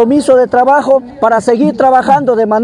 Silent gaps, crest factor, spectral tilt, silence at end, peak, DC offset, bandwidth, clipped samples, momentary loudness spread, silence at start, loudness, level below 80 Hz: none; 8 dB; -6 dB/octave; 0 s; 0 dBFS; under 0.1%; 11 kHz; 0.7%; 3 LU; 0 s; -9 LUFS; -50 dBFS